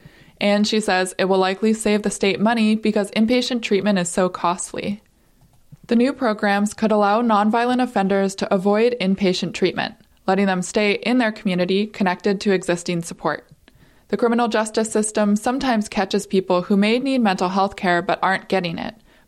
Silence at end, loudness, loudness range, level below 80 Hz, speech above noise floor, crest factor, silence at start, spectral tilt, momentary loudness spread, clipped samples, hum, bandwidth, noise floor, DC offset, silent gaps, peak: 0.35 s; -20 LUFS; 3 LU; -54 dBFS; 36 dB; 12 dB; 0.4 s; -5 dB/octave; 6 LU; under 0.1%; none; 12.5 kHz; -55 dBFS; under 0.1%; none; -6 dBFS